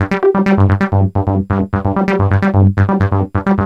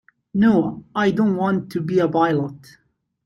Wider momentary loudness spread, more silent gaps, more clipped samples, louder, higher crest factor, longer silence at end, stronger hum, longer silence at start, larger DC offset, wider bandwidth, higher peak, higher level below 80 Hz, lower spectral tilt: second, 4 LU vs 8 LU; neither; neither; first, -14 LUFS vs -20 LUFS; about the same, 12 dB vs 16 dB; second, 0 s vs 0.7 s; neither; second, 0 s vs 0.35 s; neither; second, 6 kHz vs 12 kHz; first, -2 dBFS vs -6 dBFS; first, -36 dBFS vs -58 dBFS; first, -9.5 dB/octave vs -8 dB/octave